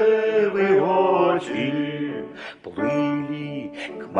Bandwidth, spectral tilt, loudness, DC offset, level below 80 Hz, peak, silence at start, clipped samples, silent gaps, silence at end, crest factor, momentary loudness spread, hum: 9.4 kHz; -7 dB/octave; -22 LUFS; under 0.1%; -66 dBFS; -6 dBFS; 0 s; under 0.1%; none; 0 s; 16 dB; 15 LU; none